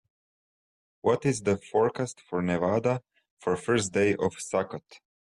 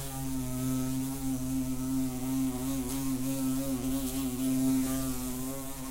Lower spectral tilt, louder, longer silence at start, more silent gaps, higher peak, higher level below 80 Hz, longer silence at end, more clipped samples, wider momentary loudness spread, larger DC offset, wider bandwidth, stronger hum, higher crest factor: about the same, -5.5 dB/octave vs -5 dB/octave; first, -28 LUFS vs -32 LUFS; first, 1.05 s vs 0 s; first, 3.31-3.37 s vs none; first, -12 dBFS vs -18 dBFS; second, -64 dBFS vs -44 dBFS; first, 0.45 s vs 0 s; neither; about the same, 8 LU vs 6 LU; neither; second, 12 kHz vs 16 kHz; neither; about the same, 16 dB vs 14 dB